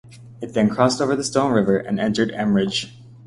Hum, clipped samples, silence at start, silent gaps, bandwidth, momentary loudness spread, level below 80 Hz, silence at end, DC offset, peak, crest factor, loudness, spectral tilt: none; under 0.1%; 0.05 s; none; 11.5 kHz; 8 LU; -54 dBFS; 0 s; under 0.1%; -2 dBFS; 18 dB; -20 LUFS; -5 dB/octave